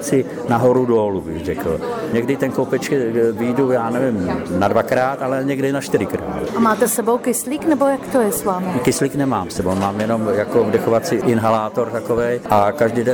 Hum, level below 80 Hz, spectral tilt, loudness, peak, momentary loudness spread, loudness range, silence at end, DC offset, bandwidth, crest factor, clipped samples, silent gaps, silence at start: none; -48 dBFS; -5.5 dB/octave; -18 LUFS; -4 dBFS; 5 LU; 1 LU; 0 s; under 0.1%; over 20 kHz; 14 dB; under 0.1%; none; 0 s